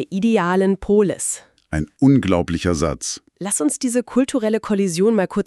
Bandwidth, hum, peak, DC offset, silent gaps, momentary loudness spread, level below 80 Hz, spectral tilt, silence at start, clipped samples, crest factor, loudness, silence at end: 13.5 kHz; none; -4 dBFS; under 0.1%; none; 10 LU; -40 dBFS; -5.5 dB/octave; 0 s; under 0.1%; 16 dB; -19 LUFS; 0.05 s